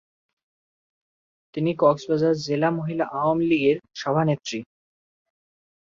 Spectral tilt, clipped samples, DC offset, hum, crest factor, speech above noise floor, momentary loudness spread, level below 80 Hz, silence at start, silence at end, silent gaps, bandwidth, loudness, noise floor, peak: -6.5 dB/octave; under 0.1%; under 0.1%; none; 20 dB; over 68 dB; 8 LU; -66 dBFS; 1.55 s; 1.2 s; none; 7.6 kHz; -23 LUFS; under -90 dBFS; -6 dBFS